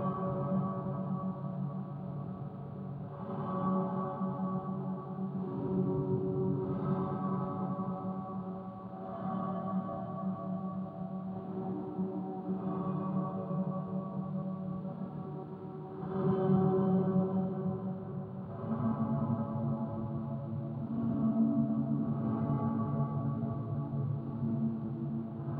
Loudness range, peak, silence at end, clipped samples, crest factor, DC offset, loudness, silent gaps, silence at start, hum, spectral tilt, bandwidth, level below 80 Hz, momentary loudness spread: 5 LU; -18 dBFS; 0 s; under 0.1%; 16 dB; under 0.1%; -35 LUFS; none; 0 s; none; -12.5 dB/octave; 3.9 kHz; -64 dBFS; 10 LU